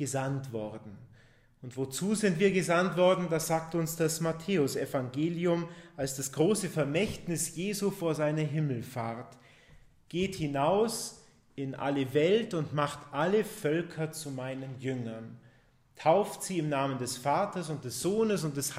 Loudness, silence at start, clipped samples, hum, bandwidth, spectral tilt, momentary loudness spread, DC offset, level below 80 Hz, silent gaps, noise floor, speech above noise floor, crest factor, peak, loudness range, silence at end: -31 LUFS; 0 s; under 0.1%; none; 16 kHz; -5 dB/octave; 12 LU; under 0.1%; -64 dBFS; none; -63 dBFS; 32 dB; 18 dB; -12 dBFS; 5 LU; 0 s